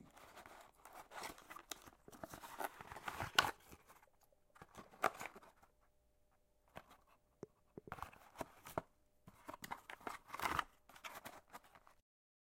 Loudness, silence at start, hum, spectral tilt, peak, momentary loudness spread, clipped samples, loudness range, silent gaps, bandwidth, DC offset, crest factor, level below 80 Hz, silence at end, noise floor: -46 LUFS; 0 s; none; -2 dB/octave; -12 dBFS; 20 LU; under 0.1%; 11 LU; none; 16 kHz; under 0.1%; 38 dB; -72 dBFS; 0.55 s; -76 dBFS